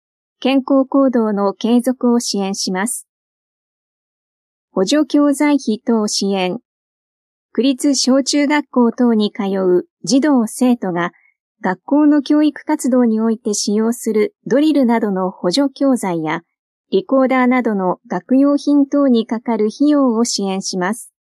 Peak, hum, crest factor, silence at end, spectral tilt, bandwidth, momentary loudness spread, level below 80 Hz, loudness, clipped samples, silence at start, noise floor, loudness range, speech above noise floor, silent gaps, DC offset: -4 dBFS; none; 12 dB; 0.35 s; -4.5 dB/octave; 13.5 kHz; 7 LU; -74 dBFS; -16 LUFS; under 0.1%; 0.4 s; under -90 dBFS; 4 LU; over 75 dB; 3.09-4.68 s, 6.65-7.49 s, 9.91-9.97 s, 11.40-11.55 s, 16.59-16.84 s; under 0.1%